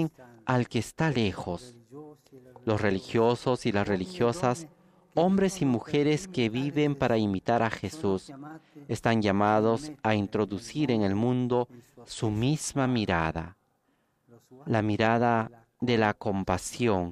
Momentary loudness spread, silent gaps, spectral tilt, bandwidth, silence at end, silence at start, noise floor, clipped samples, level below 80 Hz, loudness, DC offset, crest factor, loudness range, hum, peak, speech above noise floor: 12 LU; none; -6 dB/octave; 14.5 kHz; 0 s; 0 s; -72 dBFS; under 0.1%; -56 dBFS; -28 LUFS; under 0.1%; 20 dB; 2 LU; none; -8 dBFS; 45 dB